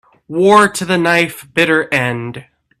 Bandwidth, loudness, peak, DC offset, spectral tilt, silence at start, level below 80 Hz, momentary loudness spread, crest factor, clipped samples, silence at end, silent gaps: 14.5 kHz; -13 LUFS; 0 dBFS; under 0.1%; -4.5 dB/octave; 0.3 s; -54 dBFS; 15 LU; 14 dB; under 0.1%; 0.4 s; none